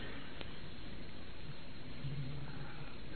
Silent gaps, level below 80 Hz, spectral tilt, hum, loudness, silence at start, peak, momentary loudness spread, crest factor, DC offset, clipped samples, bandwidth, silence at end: none; -56 dBFS; -4.5 dB/octave; none; -48 LUFS; 0 s; -24 dBFS; 6 LU; 24 dB; 1%; under 0.1%; 4.6 kHz; 0 s